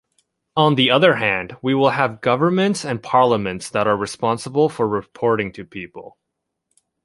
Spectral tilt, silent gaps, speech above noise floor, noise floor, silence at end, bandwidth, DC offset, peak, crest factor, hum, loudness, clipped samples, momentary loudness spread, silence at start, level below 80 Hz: -5.5 dB/octave; none; 60 dB; -78 dBFS; 0.95 s; 11.5 kHz; under 0.1%; -2 dBFS; 18 dB; none; -18 LUFS; under 0.1%; 11 LU; 0.55 s; -56 dBFS